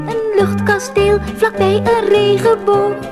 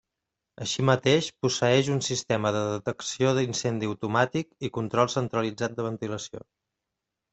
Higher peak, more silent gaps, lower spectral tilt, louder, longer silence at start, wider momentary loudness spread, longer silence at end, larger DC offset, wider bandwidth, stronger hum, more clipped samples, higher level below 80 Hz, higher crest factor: first, -2 dBFS vs -6 dBFS; neither; about the same, -5.5 dB/octave vs -4.5 dB/octave; first, -14 LUFS vs -27 LUFS; second, 0 s vs 0.6 s; second, 3 LU vs 11 LU; second, 0 s vs 0.95 s; neither; first, 13.5 kHz vs 8.4 kHz; neither; neither; first, -36 dBFS vs -62 dBFS; second, 12 dB vs 22 dB